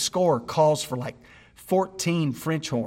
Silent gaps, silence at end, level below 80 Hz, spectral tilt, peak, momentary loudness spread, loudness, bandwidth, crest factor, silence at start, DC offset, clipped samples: none; 0 s; -60 dBFS; -5 dB/octave; -8 dBFS; 9 LU; -25 LUFS; 16.5 kHz; 16 dB; 0 s; under 0.1%; under 0.1%